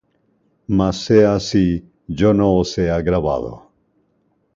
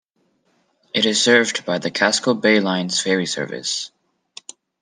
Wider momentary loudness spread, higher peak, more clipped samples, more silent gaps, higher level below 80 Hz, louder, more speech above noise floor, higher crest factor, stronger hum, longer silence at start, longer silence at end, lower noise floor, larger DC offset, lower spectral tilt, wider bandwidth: about the same, 13 LU vs 15 LU; about the same, -2 dBFS vs -2 dBFS; neither; neither; first, -38 dBFS vs -70 dBFS; about the same, -17 LUFS vs -18 LUFS; about the same, 48 dB vs 47 dB; about the same, 18 dB vs 20 dB; neither; second, 0.7 s vs 0.95 s; about the same, 1 s vs 0.95 s; about the same, -64 dBFS vs -65 dBFS; neither; first, -7 dB/octave vs -3 dB/octave; second, 7.6 kHz vs 10.5 kHz